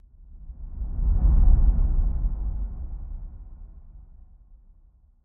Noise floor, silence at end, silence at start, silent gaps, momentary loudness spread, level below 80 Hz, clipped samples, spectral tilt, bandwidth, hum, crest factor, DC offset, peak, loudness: -56 dBFS; 1.25 s; 0.3 s; none; 25 LU; -24 dBFS; under 0.1%; -14 dB/octave; 1.5 kHz; none; 18 dB; under 0.1%; -6 dBFS; -26 LUFS